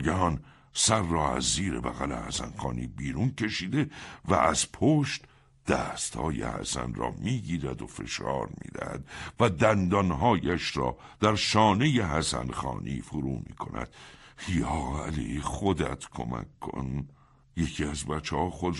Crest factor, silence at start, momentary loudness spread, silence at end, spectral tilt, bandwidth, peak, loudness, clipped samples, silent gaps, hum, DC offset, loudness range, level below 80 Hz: 22 dB; 0 s; 13 LU; 0 s; -4.5 dB/octave; 11.5 kHz; -8 dBFS; -29 LUFS; under 0.1%; none; none; under 0.1%; 7 LU; -44 dBFS